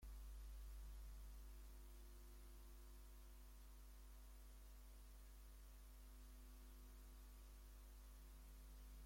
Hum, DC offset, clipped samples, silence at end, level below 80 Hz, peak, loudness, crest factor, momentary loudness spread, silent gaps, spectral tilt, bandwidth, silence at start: none; under 0.1%; under 0.1%; 0 s; -60 dBFS; -50 dBFS; -63 LUFS; 10 dB; 5 LU; none; -4.5 dB/octave; 16.5 kHz; 0 s